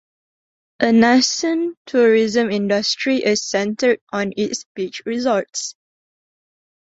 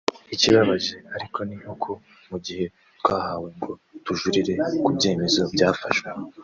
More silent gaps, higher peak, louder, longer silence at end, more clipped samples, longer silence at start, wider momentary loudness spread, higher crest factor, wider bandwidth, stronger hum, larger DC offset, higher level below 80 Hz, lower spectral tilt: first, 1.77-1.85 s, 4.01-4.07 s, 4.66-4.75 s vs none; about the same, 0 dBFS vs -2 dBFS; first, -18 LUFS vs -23 LUFS; first, 1.1 s vs 0 s; neither; first, 0.8 s vs 0.1 s; second, 11 LU vs 16 LU; about the same, 18 dB vs 22 dB; about the same, 8 kHz vs 7.6 kHz; neither; neither; about the same, -62 dBFS vs -60 dBFS; about the same, -3.5 dB/octave vs -4.5 dB/octave